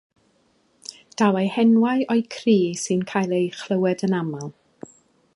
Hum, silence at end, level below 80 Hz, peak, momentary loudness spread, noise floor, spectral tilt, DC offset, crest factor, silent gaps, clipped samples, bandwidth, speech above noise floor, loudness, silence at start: none; 0.85 s; -70 dBFS; -4 dBFS; 18 LU; -63 dBFS; -6 dB/octave; under 0.1%; 18 dB; none; under 0.1%; 11.5 kHz; 43 dB; -21 LUFS; 1.2 s